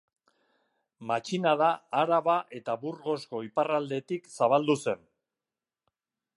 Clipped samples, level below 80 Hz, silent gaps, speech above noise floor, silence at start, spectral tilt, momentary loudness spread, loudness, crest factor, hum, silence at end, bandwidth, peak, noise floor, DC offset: under 0.1%; -80 dBFS; none; over 62 dB; 1 s; -5.5 dB/octave; 9 LU; -29 LUFS; 20 dB; none; 1.4 s; 11.5 kHz; -10 dBFS; under -90 dBFS; under 0.1%